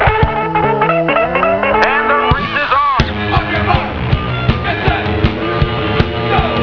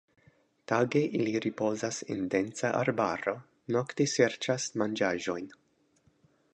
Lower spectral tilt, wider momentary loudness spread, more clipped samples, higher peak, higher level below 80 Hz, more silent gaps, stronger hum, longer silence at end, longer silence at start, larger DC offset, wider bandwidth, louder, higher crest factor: first, -7.5 dB/octave vs -4.5 dB/octave; second, 4 LU vs 7 LU; neither; first, 0 dBFS vs -10 dBFS; first, -24 dBFS vs -70 dBFS; neither; neither; second, 0 s vs 1 s; second, 0 s vs 0.7 s; neither; second, 5.4 kHz vs 10.5 kHz; first, -14 LUFS vs -30 LUFS; second, 14 dB vs 20 dB